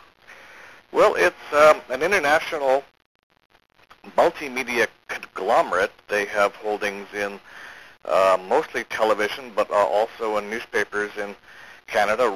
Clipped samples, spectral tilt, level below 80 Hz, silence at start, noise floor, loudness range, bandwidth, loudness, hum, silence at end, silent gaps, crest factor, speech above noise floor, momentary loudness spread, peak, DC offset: under 0.1%; -3 dB/octave; -58 dBFS; 0.3 s; -48 dBFS; 4 LU; 14.5 kHz; -22 LUFS; none; 0 s; 3.06-3.30 s, 3.45-3.50 s; 20 dB; 26 dB; 14 LU; -2 dBFS; 0.1%